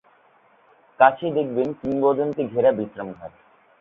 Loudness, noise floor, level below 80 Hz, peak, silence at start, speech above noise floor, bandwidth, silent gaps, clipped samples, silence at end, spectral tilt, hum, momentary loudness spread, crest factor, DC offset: -21 LUFS; -57 dBFS; -62 dBFS; -2 dBFS; 1 s; 36 dB; 4.2 kHz; none; under 0.1%; 0.5 s; -9 dB/octave; none; 17 LU; 22 dB; under 0.1%